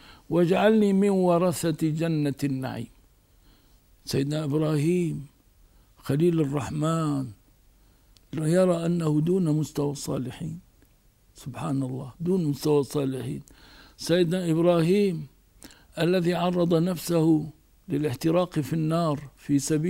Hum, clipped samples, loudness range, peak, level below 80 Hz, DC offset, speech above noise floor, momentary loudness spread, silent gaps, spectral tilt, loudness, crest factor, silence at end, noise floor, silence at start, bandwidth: none; under 0.1%; 5 LU; -8 dBFS; -58 dBFS; under 0.1%; 36 dB; 15 LU; none; -6.5 dB/octave; -25 LUFS; 18 dB; 0 s; -60 dBFS; 0.3 s; 16 kHz